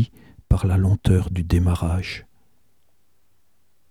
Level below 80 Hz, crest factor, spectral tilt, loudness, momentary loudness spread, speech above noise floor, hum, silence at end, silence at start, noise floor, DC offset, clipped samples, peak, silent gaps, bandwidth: -32 dBFS; 18 dB; -7.5 dB/octave; -21 LUFS; 8 LU; 49 dB; none; 1.7 s; 0 s; -69 dBFS; 0.2%; under 0.1%; -4 dBFS; none; 12.5 kHz